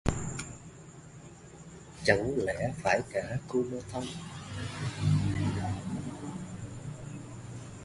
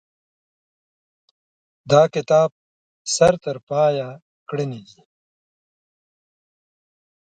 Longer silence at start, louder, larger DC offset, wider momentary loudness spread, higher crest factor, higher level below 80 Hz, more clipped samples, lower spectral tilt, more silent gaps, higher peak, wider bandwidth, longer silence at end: second, 0.05 s vs 1.85 s; second, -33 LUFS vs -19 LUFS; neither; first, 21 LU vs 15 LU; about the same, 26 dB vs 22 dB; first, -48 dBFS vs -60 dBFS; neither; about the same, -5.5 dB/octave vs -4.5 dB/octave; second, none vs 2.52-3.05 s, 3.63-3.67 s, 4.22-4.46 s; second, -8 dBFS vs -2 dBFS; first, 11.5 kHz vs 10 kHz; second, 0 s vs 2.5 s